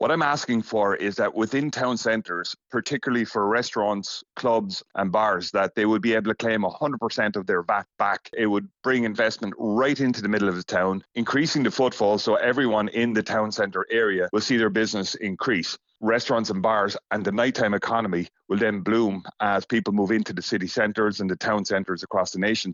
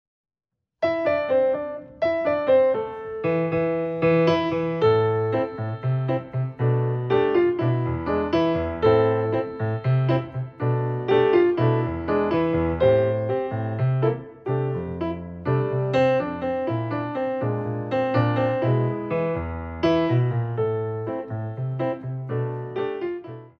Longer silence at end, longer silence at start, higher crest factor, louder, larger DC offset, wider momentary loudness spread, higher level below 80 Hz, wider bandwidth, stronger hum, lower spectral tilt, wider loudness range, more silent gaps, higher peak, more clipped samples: about the same, 0 s vs 0.1 s; second, 0 s vs 0.8 s; about the same, 16 dB vs 16 dB; about the same, -24 LUFS vs -23 LUFS; neither; second, 5 LU vs 10 LU; second, -64 dBFS vs -48 dBFS; first, 7.8 kHz vs 6.4 kHz; neither; second, -3.5 dB/octave vs -9.5 dB/octave; about the same, 2 LU vs 3 LU; neither; about the same, -6 dBFS vs -6 dBFS; neither